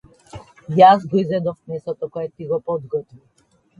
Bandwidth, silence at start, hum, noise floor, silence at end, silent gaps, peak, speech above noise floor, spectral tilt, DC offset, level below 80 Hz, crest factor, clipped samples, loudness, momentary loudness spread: 7.8 kHz; 0.35 s; none; -41 dBFS; 0.8 s; none; 0 dBFS; 22 dB; -7.5 dB/octave; under 0.1%; -58 dBFS; 20 dB; under 0.1%; -19 LUFS; 17 LU